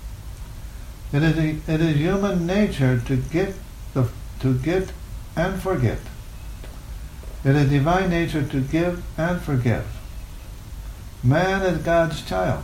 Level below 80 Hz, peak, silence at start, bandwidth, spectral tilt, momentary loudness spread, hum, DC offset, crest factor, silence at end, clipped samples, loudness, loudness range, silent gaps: -36 dBFS; -6 dBFS; 0 s; 16 kHz; -7 dB/octave; 19 LU; none; under 0.1%; 16 dB; 0 s; under 0.1%; -22 LUFS; 4 LU; none